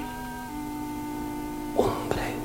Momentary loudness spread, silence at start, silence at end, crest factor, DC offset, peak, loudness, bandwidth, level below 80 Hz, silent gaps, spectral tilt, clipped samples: 9 LU; 0 s; 0 s; 24 dB; under 0.1%; -8 dBFS; -31 LUFS; 16.5 kHz; -44 dBFS; none; -5.5 dB/octave; under 0.1%